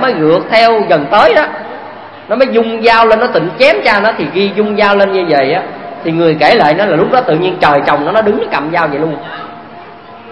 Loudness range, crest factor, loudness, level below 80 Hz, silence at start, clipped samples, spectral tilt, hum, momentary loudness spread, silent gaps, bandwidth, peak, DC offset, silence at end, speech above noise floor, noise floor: 2 LU; 10 dB; -10 LUFS; -46 dBFS; 0 s; 0.4%; -6.5 dB/octave; none; 16 LU; none; 11 kHz; 0 dBFS; under 0.1%; 0 s; 22 dB; -32 dBFS